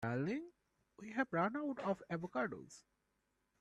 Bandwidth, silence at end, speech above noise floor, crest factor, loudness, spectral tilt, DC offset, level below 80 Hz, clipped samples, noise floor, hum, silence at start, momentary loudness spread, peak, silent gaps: 11.5 kHz; 0.8 s; 43 dB; 20 dB; -41 LUFS; -7 dB/octave; under 0.1%; -78 dBFS; under 0.1%; -83 dBFS; none; 0 s; 20 LU; -22 dBFS; none